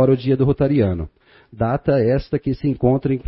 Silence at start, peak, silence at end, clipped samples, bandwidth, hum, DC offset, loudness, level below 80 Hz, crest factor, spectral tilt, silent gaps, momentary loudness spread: 0 s; -4 dBFS; 0.05 s; under 0.1%; 5.8 kHz; none; under 0.1%; -19 LUFS; -38 dBFS; 14 dB; -13.5 dB/octave; none; 7 LU